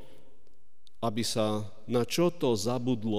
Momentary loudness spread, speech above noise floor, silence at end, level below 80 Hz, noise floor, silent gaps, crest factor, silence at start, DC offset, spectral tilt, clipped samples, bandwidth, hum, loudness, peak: 7 LU; 38 dB; 0 s; -66 dBFS; -67 dBFS; none; 16 dB; 1 s; 1%; -5 dB/octave; under 0.1%; 15.5 kHz; none; -30 LUFS; -16 dBFS